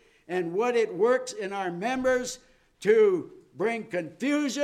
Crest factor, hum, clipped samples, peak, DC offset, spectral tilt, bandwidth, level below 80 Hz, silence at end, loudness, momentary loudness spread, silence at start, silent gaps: 18 dB; none; under 0.1%; -10 dBFS; under 0.1%; -4.5 dB/octave; 14 kHz; -64 dBFS; 0 s; -27 LUFS; 12 LU; 0.3 s; none